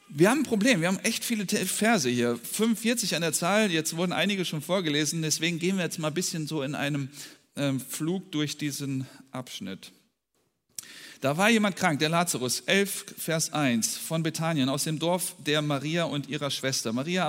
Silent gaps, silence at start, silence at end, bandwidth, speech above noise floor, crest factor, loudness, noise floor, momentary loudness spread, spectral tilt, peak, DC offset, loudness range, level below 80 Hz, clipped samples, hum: none; 0.1 s; 0 s; 16 kHz; 48 dB; 20 dB; -27 LUFS; -75 dBFS; 12 LU; -4 dB/octave; -6 dBFS; under 0.1%; 7 LU; -74 dBFS; under 0.1%; none